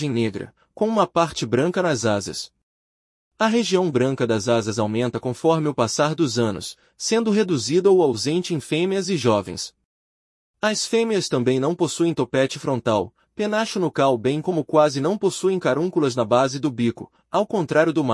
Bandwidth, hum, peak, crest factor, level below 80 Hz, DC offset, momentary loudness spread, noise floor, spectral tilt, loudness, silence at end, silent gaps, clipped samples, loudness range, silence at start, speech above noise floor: 12 kHz; none; -4 dBFS; 18 dB; -62 dBFS; under 0.1%; 7 LU; under -90 dBFS; -5 dB/octave; -21 LUFS; 0 s; 2.63-3.31 s, 9.85-10.54 s; under 0.1%; 2 LU; 0 s; over 69 dB